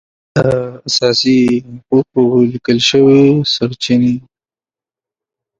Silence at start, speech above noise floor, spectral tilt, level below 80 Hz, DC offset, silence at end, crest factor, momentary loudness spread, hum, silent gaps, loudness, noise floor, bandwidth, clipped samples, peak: 0.35 s; over 78 dB; -5.5 dB/octave; -48 dBFS; under 0.1%; 1.4 s; 14 dB; 8 LU; none; none; -12 LUFS; under -90 dBFS; 7.8 kHz; under 0.1%; 0 dBFS